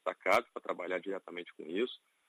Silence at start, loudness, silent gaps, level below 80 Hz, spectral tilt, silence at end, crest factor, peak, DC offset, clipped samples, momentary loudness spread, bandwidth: 0.05 s; -36 LUFS; none; -78 dBFS; -4 dB/octave; 0.35 s; 20 dB; -16 dBFS; under 0.1%; under 0.1%; 12 LU; 13 kHz